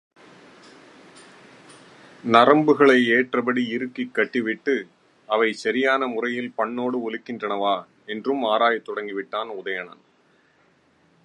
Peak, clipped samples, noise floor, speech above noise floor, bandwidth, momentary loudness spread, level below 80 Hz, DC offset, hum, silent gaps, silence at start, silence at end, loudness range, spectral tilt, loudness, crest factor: 0 dBFS; under 0.1%; -61 dBFS; 39 dB; 11 kHz; 14 LU; -76 dBFS; under 0.1%; none; none; 2.25 s; 1.35 s; 6 LU; -5.5 dB/octave; -22 LUFS; 22 dB